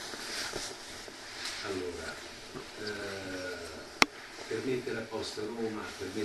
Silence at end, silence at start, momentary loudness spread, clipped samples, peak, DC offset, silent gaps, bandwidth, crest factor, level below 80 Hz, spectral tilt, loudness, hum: 0 s; 0 s; 15 LU; under 0.1%; 0 dBFS; under 0.1%; none; 12.5 kHz; 38 dB; -62 dBFS; -2.5 dB/octave; -36 LUFS; none